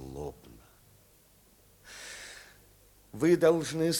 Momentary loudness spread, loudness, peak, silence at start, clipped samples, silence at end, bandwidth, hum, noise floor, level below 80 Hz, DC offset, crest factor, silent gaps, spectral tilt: 25 LU; -27 LUFS; -12 dBFS; 0 s; under 0.1%; 0 s; 19.5 kHz; none; -62 dBFS; -60 dBFS; under 0.1%; 20 dB; none; -5 dB/octave